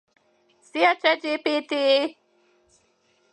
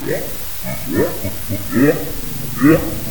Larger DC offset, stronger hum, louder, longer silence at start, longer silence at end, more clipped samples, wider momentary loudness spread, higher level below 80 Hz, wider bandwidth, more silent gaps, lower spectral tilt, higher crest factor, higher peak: second, under 0.1% vs 5%; neither; second, -22 LUFS vs -18 LUFS; first, 0.75 s vs 0 s; first, 1.2 s vs 0 s; neither; about the same, 8 LU vs 10 LU; second, -82 dBFS vs -36 dBFS; second, 10.5 kHz vs over 20 kHz; neither; second, -2 dB/octave vs -5.5 dB/octave; about the same, 20 dB vs 18 dB; second, -6 dBFS vs 0 dBFS